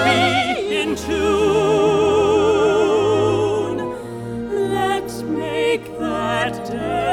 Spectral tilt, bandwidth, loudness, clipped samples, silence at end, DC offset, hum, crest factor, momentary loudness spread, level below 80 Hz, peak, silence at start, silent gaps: -5 dB/octave; 14.5 kHz; -19 LUFS; under 0.1%; 0 s; under 0.1%; none; 14 dB; 9 LU; -44 dBFS; -4 dBFS; 0 s; none